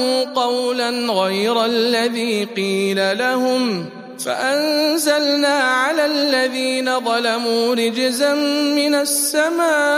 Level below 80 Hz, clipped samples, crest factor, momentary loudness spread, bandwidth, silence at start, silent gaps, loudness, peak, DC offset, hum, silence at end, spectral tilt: -76 dBFS; under 0.1%; 14 dB; 4 LU; 15.5 kHz; 0 s; none; -17 LUFS; -2 dBFS; under 0.1%; none; 0 s; -2.5 dB/octave